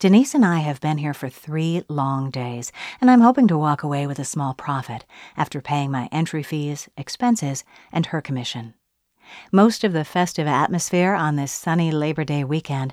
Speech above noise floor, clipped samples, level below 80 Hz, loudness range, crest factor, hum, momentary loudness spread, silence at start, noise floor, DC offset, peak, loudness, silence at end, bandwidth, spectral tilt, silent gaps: 40 dB; under 0.1%; -62 dBFS; 6 LU; 18 dB; none; 14 LU; 0 s; -61 dBFS; under 0.1%; -4 dBFS; -21 LUFS; 0 s; 15.5 kHz; -6 dB/octave; none